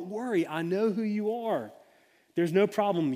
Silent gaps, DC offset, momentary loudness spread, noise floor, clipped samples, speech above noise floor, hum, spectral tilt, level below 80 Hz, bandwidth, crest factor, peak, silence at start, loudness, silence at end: none; under 0.1%; 8 LU; -63 dBFS; under 0.1%; 35 dB; none; -7 dB/octave; -80 dBFS; 15.5 kHz; 16 dB; -12 dBFS; 0 s; -29 LUFS; 0 s